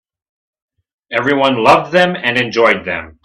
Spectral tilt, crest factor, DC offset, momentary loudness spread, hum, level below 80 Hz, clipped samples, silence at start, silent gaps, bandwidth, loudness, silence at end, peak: -5 dB/octave; 14 dB; under 0.1%; 7 LU; none; -52 dBFS; under 0.1%; 1.1 s; none; 12.5 kHz; -13 LUFS; 0.15 s; 0 dBFS